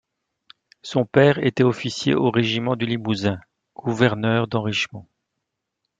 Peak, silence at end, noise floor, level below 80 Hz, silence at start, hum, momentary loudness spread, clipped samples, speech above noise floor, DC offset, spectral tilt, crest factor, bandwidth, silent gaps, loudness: -2 dBFS; 0.95 s; -80 dBFS; -60 dBFS; 0.85 s; none; 11 LU; under 0.1%; 60 dB; under 0.1%; -6 dB/octave; 20 dB; 9 kHz; none; -21 LUFS